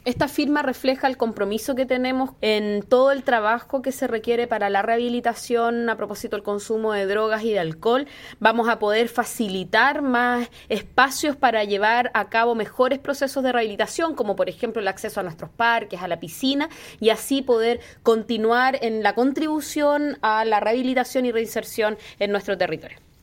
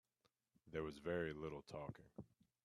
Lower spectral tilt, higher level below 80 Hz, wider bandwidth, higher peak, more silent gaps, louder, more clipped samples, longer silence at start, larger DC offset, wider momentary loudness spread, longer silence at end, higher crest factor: second, -4 dB/octave vs -7 dB/octave; first, -56 dBFS vs -72 dBFS; first, 16.5 kHz vs 13 kHz; first, -2 dBFS vs -30 dBFS; neither; first, -22 LUFS vs -48 LUFS; neither; second, 0.05 s vs 0.65 s; neither; second, 7 LU vs 16 LU; second, 0.25 s vs 0.4 s; about the same, 20 dB vs 20 dB